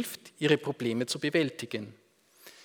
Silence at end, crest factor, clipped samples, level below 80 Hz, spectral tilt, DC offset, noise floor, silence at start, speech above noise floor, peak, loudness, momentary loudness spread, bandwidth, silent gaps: 0 s; 22 dB; under 0.1%; -80 dBFS; -4.5 dB/octave; under 0.1%; -57 dBFS; 0 s; 26 dB; -10 dBFS; -30 LUFS; 11 LU; over 20 kHz; none